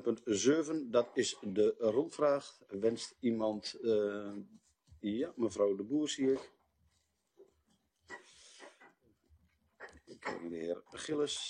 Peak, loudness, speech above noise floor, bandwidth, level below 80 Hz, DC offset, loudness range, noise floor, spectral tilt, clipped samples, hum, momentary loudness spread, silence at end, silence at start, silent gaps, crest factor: -16 dBFS; -35 LUFS; 44 dB; 10 kHz; -76 dBFS; under 0.1%; 15 LU; -78 dBFS; -4 dB/octave; under 0.1%; none; 20 LU; 0 s; 0 s; none; 20 dB